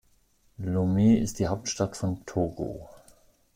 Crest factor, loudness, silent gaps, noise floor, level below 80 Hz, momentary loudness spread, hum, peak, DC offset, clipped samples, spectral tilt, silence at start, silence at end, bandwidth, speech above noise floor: 16 dB; -27 LUFS; none; -64 dBFS; -52 dBFS; 14 LU; none; -12 dBFS; under 0.1%; under 0.1%; -6.5 dB/octave; 0.6 s; 0.65 s; 16 kHz; 38 dB